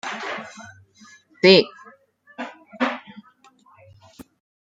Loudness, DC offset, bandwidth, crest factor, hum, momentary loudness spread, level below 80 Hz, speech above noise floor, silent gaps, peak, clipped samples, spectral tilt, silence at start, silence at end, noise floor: -19 LUFS; under 0.1%; 7.8 kHz; 22 dB; none; 22 LU; -72 dBFS; 36 dB; none; -2 dBFS; under 0.1%; -5 dB/octave; 0.05 s; 0.55 s; -55 dBFS